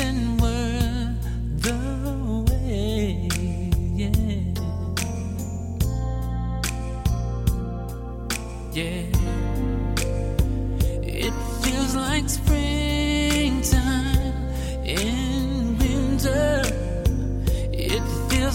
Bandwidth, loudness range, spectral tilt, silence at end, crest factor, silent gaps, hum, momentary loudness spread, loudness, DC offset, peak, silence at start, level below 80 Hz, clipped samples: 16.5 kHz; 4 LU; -5 dB/octave; 0 s; 18 dB; none; none; 7 LU; -25 LUFS; under 0.1%; -6 dBFS; 0 s; -26 dBFS; under 0.1%